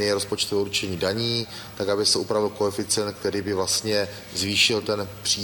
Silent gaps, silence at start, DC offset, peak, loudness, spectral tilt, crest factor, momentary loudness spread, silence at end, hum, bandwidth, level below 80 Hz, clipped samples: none; 0 s; under 0.1%; -6 dBFS; -23 LUFS; -2.5 dB/octave; 18 dB; 8 LU; 0 s; none; over 20 kHz; -56 dBFS; under 0.1%